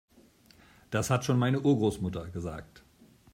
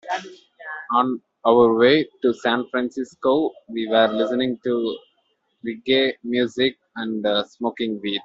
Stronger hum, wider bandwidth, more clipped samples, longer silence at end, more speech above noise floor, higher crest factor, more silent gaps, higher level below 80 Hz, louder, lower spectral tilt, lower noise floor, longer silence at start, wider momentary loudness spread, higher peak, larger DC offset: neither; first, 16 kHz vs 7.8 kHz; neither; first, 0.55 s vs 0.05 s; second, 31 dB vs 48 dB; about the same, 18 dB vs 18 dB; neither; about the same, -58 dBFS vs -62 dBFS; second, -29 LUFS vs -21 LUFS; about the same, -6.5 dB/octave vs -5.5 dB/octave; second, -60 dBFS vs -68 dBFS; first, 0.9 s vs 0.05 s; about the same, 13 LU vs 14 LU; second, -12 dBFS vs -2 dBFS; neither